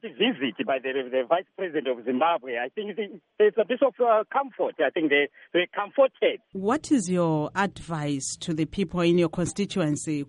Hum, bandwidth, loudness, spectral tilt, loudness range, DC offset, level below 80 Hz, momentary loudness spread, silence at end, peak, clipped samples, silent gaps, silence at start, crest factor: none; 11.5 kHz; -26 LUFS; -5 dB/octave; 2 LU; under 0.1%; -58 dBFS; 8 LU; 0.05 s; -8 dBFS; under 0.1%; none; 0.05 s; 16 dB